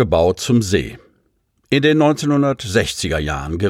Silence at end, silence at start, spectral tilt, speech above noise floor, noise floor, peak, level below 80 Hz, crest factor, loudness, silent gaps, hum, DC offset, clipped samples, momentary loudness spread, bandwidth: 0 s; 0 s; -5.5 dB/octave; 47 dB; -64 dBFS; -2 dBFS; -36 dBFS; 16 dB; -17 LUFS; none; none; under 0.1%; under 0.1%; 7 LU; 16 kHz